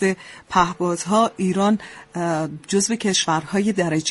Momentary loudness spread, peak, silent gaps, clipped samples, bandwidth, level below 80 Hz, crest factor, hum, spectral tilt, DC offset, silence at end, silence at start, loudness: 6 LU; -4 dBFS; none; under 0.1%; 11.5 kHz; -52 dBFS; 18 dB; none; -4 dB/octave; under 0.1%; 0 s; 0 s; -21 LUFS